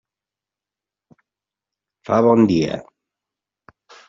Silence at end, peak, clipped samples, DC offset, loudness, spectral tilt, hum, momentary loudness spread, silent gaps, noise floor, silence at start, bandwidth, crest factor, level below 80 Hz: 1.25 s; -2 dBFS; under 0.1%; under 0.1%; -17 LUFS; -6.5 dB/octave; none; 12 LU; none; -88 dBFS; 2.1 s; 7.4 kHz; 20 dB; -58 dBFS